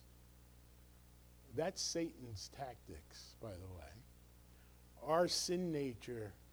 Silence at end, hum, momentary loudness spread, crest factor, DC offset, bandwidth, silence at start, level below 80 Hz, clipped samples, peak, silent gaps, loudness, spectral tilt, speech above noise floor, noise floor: 0 s; 60 Hz at -65 dBFS; 27 LU; 22 dB; under 0.1%; over 20 kHz; 0 s; -64 dBFS; under 0.1%; -22 dBFS; none; -42 LUFS; -4 dB/octave; 21 dB; -63 dBFS